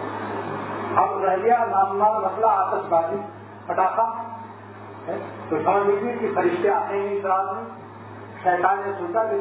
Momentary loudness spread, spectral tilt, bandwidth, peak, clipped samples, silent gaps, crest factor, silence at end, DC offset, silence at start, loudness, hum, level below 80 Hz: 18 LU; -10 dB/octave; 4 kHz; -6 dBFS; under 0.1%; none; 18 dB; 0 s; under 0.1%; 0 s; -23 LUFS; none; -66 dBFS